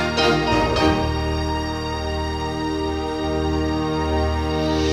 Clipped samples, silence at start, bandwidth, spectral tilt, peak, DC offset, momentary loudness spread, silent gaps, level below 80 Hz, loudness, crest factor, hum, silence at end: under 0.1%; 0 s; 13 kHz; -5.5 dB/octave; -4 dBFS; under 0.1%; 7 LU; none; -30 dBFS; -22 LUFS; 16 dB; none; 0 s